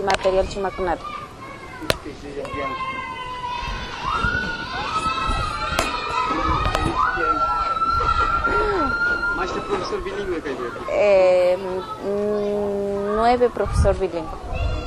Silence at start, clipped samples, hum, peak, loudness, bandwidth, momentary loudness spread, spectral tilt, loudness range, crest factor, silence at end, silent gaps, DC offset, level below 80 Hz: 0 s; under 0.1%; none; 0 dBFS; -22 LUFS; 15 kHz; 10 LU; -5 dB/octave; 6 LU; 22 dB; 0 s; none; under 0.1%; -32 dBFS